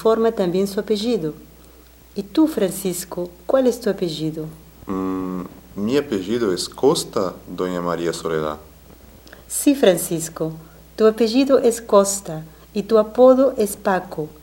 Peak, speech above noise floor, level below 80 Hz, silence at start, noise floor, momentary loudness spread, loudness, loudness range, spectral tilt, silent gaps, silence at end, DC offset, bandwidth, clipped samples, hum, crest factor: -2 dBFS; 27 dB; -50 dBFS; 0 s; -47 dBFS; 14 LU; -20 LUFS; 6 LU; -5 dB/octave; none; 0.1 s; under 0.1%; 17 kHz; under 0.1%; none; 18 dB